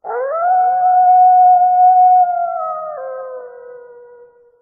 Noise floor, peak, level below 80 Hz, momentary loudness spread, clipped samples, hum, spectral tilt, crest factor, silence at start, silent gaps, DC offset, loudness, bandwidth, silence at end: -44 dBFS; -4 dBFS; -72 dBFS; 18 LU; under 0.1%; none; 6 dB/octave; 10 dB; 0.05 s; none; under 0.1%; -12 LUFS; 2.3 kHz; 0.85 s